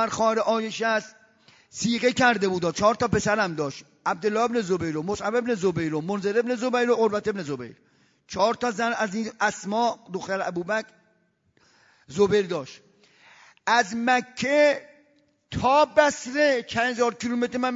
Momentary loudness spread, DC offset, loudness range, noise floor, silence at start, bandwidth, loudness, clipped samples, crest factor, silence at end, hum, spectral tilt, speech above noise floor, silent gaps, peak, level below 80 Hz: 11 LU; under 0.1%; 5 LU; -67 dBFS; 0 s; 7.8 kHz; -24 LUFS; under 0.1%; 20 dB; 0 s; none; -4.5 dB/octave; 43 dB; none; -4 dBFS; -58 dBFS